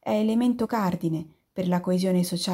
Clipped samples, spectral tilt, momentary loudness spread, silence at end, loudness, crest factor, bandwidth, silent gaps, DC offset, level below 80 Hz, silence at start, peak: under 0.1%; -6.5 dB/octave; 8 LU; 0 s; -25 LUFS; 12 dB; 16 kHz; none; under 0.1%; -62 dBFS; 0.05 s; -14 dBFS